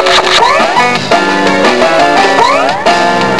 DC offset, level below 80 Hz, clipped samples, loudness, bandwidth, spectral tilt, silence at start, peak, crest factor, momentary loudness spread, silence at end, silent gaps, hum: 4%; -42 dBFS; 0.9%; -7 LUFS; 11 kHz; -3 dB/octave; 0 s; 0 dBFS; 8 dB; 3 LU; 0 s; none; none